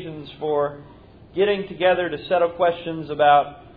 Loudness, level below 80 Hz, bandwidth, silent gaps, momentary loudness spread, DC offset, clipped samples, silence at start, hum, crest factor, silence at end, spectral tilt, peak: -21 LUFS; -54 dBFS; 5 kHz; none; 13 LU; under 0.1%; under 0.1%; 0 s; none; 16 dB; 0.1 s; -8.5 dB/octave; -4 dBFS